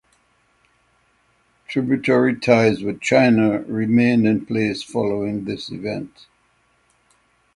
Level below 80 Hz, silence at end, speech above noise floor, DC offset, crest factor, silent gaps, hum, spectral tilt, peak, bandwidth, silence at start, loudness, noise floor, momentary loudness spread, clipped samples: -56 dBFS; 1.5 s; 44 dB; under 0.1%; 20 dB; none; none; -6.5 dB/octave; -2 dBFS; 11 kHz; 1.7 s; -19 LUFS; -62 dBFS; 12 LU; under 0.1%